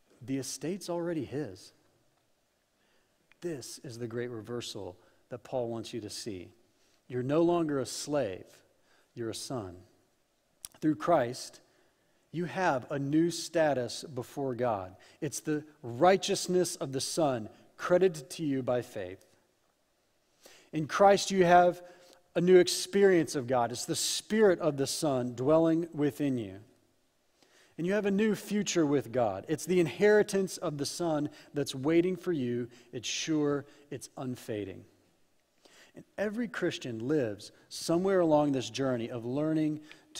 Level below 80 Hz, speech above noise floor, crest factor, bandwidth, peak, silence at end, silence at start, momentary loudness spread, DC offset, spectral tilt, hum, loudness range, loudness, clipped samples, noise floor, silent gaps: -70 dBFS; 43 dB; 22 dB; 16 kHz; -10 dBFS; 0 s; 0.2 s; 17 LU; under 0.1%; -5 dB/octave; none; 12 LU; -30 LUFS; under 0.1%; -73 dBFS; none